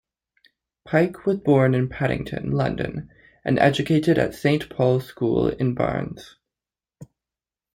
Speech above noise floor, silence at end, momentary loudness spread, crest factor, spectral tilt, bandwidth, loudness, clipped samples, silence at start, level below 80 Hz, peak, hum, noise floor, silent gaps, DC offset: over 69 dB; 0.7 s; 11 LU; 20 dB; -7.5 dB/octave; 16 kHz; -22 LUFS; under 0.1%; 0.85 s; -48 dBFS; -4 dBFS; none; under -90 dBFS; none; under 0.1%